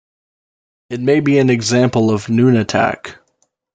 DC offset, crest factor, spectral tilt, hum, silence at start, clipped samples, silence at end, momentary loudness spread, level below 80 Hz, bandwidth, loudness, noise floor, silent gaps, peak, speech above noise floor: under 0.1%; 14 dB; -6 dB/octave; none; 0.9 s; under 0.1%; 0.6 s; 13 LU; -54 dBFS; 9.2 kHz; -14 LUFS; -65 dBFS; none; -2 dBFS; 51 dB